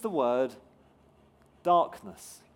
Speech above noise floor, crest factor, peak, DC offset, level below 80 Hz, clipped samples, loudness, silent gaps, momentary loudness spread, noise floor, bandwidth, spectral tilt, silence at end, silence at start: 32 dB; 18 dB; -12 dBFS; under 0.1%; -72 dBFS; under 0.1%; -28 LUFS; none; 20 LU; -61 dBFS; 17 kHz; -5.5 dB/octave; 0.2 s; 0 s